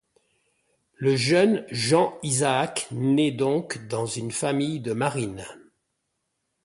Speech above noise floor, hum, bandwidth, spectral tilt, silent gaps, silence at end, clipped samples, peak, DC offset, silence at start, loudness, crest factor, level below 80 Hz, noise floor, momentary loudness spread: 54 dB; none; 11.5 kHz; -4.5 dB/octave; none; 1.05 s; under 0.1%; -6 dBFS; under 0.1%; 1 s; -24 LUFS; 18 dB; -62 dBFS; -78 dBFS; 9 LU